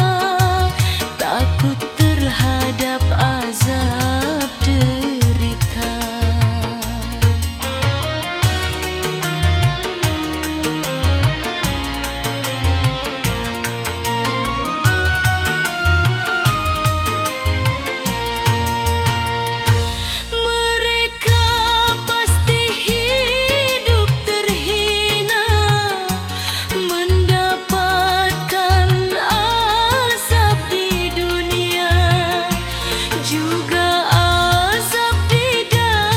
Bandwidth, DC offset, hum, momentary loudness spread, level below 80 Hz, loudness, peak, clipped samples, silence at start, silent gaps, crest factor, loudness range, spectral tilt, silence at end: 17 kHz; under 0.1%; none; 6 LU; -30 dBFS; -17 LUFS; -2 dBFS; under 0.1%; 0 s; none; 16 dB; 4 LU; -4.5 dB/octave; 0 s